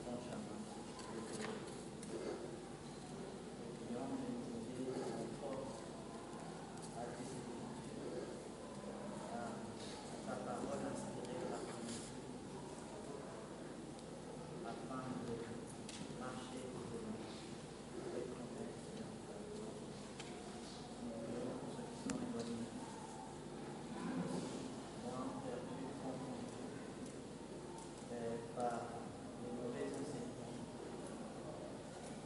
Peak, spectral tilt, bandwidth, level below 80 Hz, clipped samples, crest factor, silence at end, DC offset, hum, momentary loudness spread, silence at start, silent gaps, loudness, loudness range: -22 dBFS; -5 dB/octave; 11.5 kHz; -70 dBFS; under 0.1%; 24 dB; 0 s; under 0.1%; none; 6 LU; 0 s; none; -48 LUFS; 3 LU